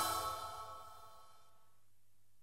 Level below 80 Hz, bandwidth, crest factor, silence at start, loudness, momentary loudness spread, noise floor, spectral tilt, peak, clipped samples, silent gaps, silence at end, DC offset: -70 dBFS; 16 kHz; 22 dB; 0 s; -43 LUFS; 23 LU; -78 dBFS; -1.5 dB/octave; -24 dBFS; under 0.1%; none; 1.05 s; 0.1%